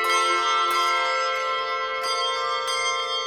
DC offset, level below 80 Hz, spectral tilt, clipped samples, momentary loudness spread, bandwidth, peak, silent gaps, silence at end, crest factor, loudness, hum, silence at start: under 0.1%; -64 dBFS; 1 dB/octave; under 0.1%; 5 LU; 18 kHz; -10 dBFS; none; 0 s; 14 dB; -22 LUFS; none; 0 s